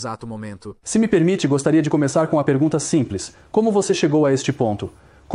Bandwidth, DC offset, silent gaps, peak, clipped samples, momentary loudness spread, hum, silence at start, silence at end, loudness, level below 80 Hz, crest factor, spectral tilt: 11.5 kHz; under 0.1%; none; -4 dBFS; under 0.1%; 14 LU; none; 0 s; 0 s; -19 LUFS; -52 dBFS; 16 dB; -6 dB/octave